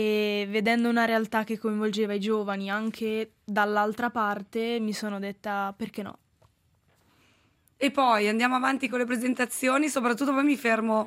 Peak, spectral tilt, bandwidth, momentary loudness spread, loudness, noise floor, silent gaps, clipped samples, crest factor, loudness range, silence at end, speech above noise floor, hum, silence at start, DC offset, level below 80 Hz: -8 dBFS; -4.5 dB/octave; 16 kHz; 8 LU; -27 LUFS; -67 dBFS; none; under 0.1%; 20 dB; 8 LU; 0 s; 41 dB; none; 0 s; under 0.1%; -74 dBFS